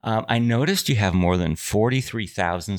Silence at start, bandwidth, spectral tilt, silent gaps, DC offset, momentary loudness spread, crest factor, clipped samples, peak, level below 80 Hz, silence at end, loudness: 0.05 s; 19 kHz; -5.5 dB/octave; none; under 0.1%; 5 LU; 18 dB; under 0.1%; -4 dBFS; -44 dBFS; 0 s; -22 LUFS